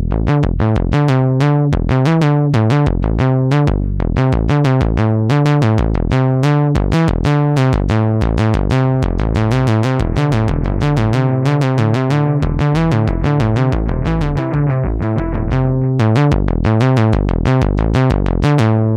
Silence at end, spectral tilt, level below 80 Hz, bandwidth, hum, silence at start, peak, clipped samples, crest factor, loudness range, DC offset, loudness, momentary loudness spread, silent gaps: 0 s; -8 dB/octave; -22 dBFS; 9.4 kHz; none; 0 s; -2 dBFS; under 0.1%; 10 dB; 2 LU; under 0.1%; -15 LUFS; 4 LU; none